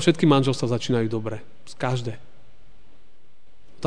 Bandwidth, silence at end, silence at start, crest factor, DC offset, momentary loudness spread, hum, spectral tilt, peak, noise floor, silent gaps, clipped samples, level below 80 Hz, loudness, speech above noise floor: 10 kHz; 0 s; 0 s; 20 dB; 2%; 19 LU; none; -6 dB/octave; -4 dBFS; -61 dBFS; none; under 0.1%; -58 dBFS; -24 LUFS; 38 dB